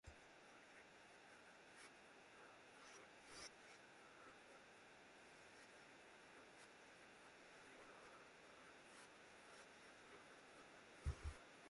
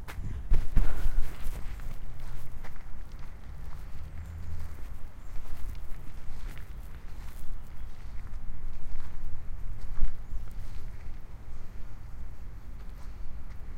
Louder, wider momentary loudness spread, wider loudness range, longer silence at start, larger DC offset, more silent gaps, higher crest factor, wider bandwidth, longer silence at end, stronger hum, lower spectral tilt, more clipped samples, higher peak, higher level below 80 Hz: second, -62 LUFS vs -42 LUFS; second, 7 LU vs 12 LU; second, 4 LU vs 7 LU; about the same, 0.05 s vs 0 s; neither; neither; first, 26 dB vs 18 dB; first, 11.5 kHz vs 3 kHz; about the same, 0 s vs 0 s; neither; second, -4 dB/octave vs -6 dB/octave; neither; second, -36 dBFS vs -8 dBFS; second, -66 dBFS vs -32 dBFS